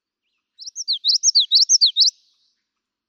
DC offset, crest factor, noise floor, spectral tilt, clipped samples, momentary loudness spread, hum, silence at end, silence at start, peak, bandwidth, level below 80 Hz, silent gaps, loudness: under 0.1%; 14 dB; -80 dBFS; 11 dB/octave; under 0.1%; 14 LU; none; 1 s; 0.6 s; -6 dBFS; 19.5 kHz; under -90 dBFS; none; -14 LUFS